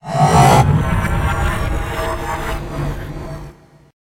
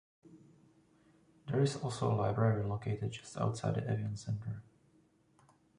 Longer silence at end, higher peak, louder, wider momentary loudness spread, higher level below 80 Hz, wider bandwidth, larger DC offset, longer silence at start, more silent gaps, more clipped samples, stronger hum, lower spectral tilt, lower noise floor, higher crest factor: second, 0.6 s vs 1.15 s; first, 0 dBFS vs -18 dBFS; first, -16 LUFS vs -36 LUFS; first, 18 LU vs 9 LU; first, -26 dBFS vs -62 dBFS; first, 16 kHz vs 11 kHz; neither; second, 0.05 s vs 0.25 s; neither; neither; neither; about the same, -6 dB/octave vs -7 dB/octave; second, -39 dBFS vs -69 dBFS; about the same, 16 dB vs 20 dB